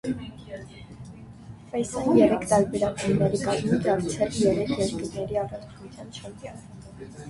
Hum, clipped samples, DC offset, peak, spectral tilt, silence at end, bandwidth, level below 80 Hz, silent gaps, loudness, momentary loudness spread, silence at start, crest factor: none; under 0.1%; under 0.1%; -6 dBFS; -6 dB/octave; 0 s; 11.5 kHz; -50 dBFS; none; -25 LUFS; 23 LU; 0.05 s; 20 dB